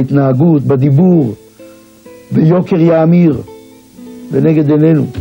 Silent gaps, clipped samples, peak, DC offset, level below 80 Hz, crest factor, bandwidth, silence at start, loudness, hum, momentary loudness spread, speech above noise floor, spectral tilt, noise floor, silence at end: none; under 0.1%; 0 dBFS; under 0.1%; -50 dBFS; 10 dB; 16 kHz; 0 s; -10 LUFS; none; 10 LU; 28 dB; -10.5 dB/octave; -37 dBFS; 0 s